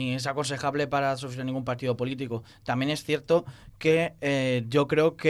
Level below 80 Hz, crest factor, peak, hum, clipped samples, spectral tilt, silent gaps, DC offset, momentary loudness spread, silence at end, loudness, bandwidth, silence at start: -60 dBFS; 16 dB; -10 dBFS; none; under 0.1%; -5.5 dB/octave; none; under 0.1%; 8 LU; 0 s; -27 LUFS; 13.5 kHz; 0 s